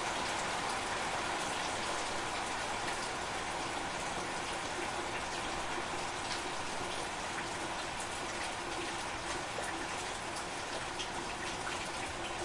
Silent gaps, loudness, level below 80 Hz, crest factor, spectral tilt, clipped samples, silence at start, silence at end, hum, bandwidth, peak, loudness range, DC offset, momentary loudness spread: none; -37 LUFS; -56 dBFS; 16 dB; -2 dB/octave; under 0.1%; 0 s; 0 s; none; 11.5 kHz; -22 dBFS; 2 LU; under 0.1%; 3 LU